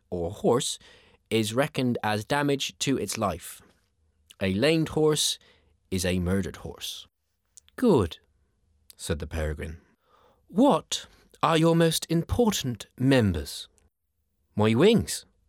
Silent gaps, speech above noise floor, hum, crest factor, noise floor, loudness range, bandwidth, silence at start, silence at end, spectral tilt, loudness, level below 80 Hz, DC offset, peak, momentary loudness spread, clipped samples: none; 52 dB; none; 20 dB; -77 dBFS; 5 LU; 17.5 kHz; 0.1 s; 0.3 s; -5 dB/octave; -26 LUFS; -50 dBFS; under 0.1%; -6 dBFS; 15 LU; under 0.1%